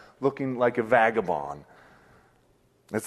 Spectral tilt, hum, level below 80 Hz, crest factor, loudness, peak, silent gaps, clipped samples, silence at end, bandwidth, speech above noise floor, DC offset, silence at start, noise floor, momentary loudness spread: -6 dB/octave; none; -64 dBFS; 22 dB; -25 LUFS; -6 dBFS; none; under 0.1%; 0 s; 13 kHz; 39 dB; under 0.1%; 0.2 s; -64 dBFS; 14 LU